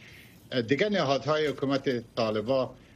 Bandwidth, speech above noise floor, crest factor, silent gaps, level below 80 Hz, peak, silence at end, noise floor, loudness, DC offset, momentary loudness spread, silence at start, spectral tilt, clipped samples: 14.5 kHz; 23 dB; 18 dB; none; -62 dBFS; -12 dBFS; 0.2 s; -51 dBFS; -28 LUFS; under 0.1%; 5 LU; 0 s; -6 dB/octave; under 0.1%